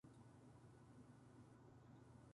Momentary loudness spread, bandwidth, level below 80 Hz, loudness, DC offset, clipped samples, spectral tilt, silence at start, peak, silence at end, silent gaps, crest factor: 1 LU; 11 kHz; -80 dBFS; -66 LUFS; under 0.1%; under 0.1%; -7 dB/octave; 0.05 s; -52 dBFS; 0 s; none; 12 dB